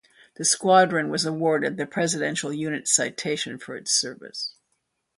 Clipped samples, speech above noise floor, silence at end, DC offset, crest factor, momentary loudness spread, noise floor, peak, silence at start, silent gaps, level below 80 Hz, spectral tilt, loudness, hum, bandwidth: under 0.1%; 51 dB; 0.65 s; under 0.1%; 20 dB; 14 LU; -75 dBFS; -4 dBFS; 0.4 s; none; -70 dBFS; -2.5 dB/octave; -23 LUFS; none; 11.5 kHz